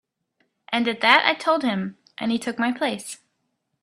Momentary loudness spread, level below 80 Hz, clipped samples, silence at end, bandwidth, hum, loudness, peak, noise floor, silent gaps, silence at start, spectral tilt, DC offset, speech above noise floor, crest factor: 17 LU; -70 dBFS; under 0.1%; 0.65 s; 14 kHz; none; -21 LUFS; 0 dBFS; -75 dBFS; none; 0.7 s; -3.5 dB/octave; under 0.1%; 53 dB; 24 dB